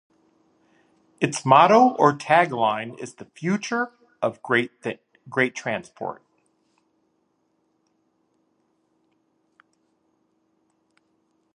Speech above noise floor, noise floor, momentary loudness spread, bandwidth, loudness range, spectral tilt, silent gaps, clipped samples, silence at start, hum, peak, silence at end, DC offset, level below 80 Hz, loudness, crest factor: 49 dB; -70 dBFS; 19 LU; 11 kHz; 12 LU; -5 dB/octave; none; under 0.1%; 1.2 s; none; -2 dBFS; 5.4 s; under 0.1%; -74 dBFS; -22 LUFS; 24 dB